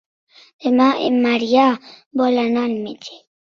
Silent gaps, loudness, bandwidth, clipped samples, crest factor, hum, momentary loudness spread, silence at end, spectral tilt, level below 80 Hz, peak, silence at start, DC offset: 2.06-2.11 s; -18 LUFS; 6.8 kHz; under 0.1%; 16 dB; none; 14 LU; 0.25 s; -5 dB/octave; -64 dBFS; -2 dBFS; 0.6 s; under 0.1%